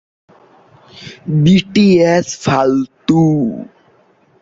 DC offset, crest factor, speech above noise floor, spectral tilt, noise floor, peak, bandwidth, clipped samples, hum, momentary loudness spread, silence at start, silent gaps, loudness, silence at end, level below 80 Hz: under 0.1%; 14 dB; 40 dB; -6.5 dB/octave; -52 dBFS; 0 dBFS; 7.8 kHz; under 0.1%; none; 19 LU; 0.95 s; none; -13 LUFS; 0.75 s; -48 dBFS